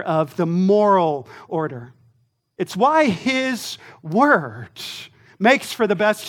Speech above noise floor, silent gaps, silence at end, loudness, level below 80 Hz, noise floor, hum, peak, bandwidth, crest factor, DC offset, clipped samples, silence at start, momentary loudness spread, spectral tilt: 44 dB; none; 0 s; -19 LUFS; -68 dBFS; -63 dBFS; none; -2 dBFS; 18 kHz; 18 dB; under 0.1%; under 0.1%; 0 s; 16 LU; -5.5 dB/octave